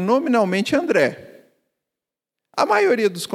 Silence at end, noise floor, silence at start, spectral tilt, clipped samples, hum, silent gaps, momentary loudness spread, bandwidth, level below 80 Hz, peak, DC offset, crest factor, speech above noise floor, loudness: 0 s; -87 dBFS; 0 s; -5 dB/octave; under 0.1%; none; none; 6 LU; 15 kHz; -66 dBFS; -2 dBFS; under 0.1%; 18 dB; 68 dB; -19 LUFS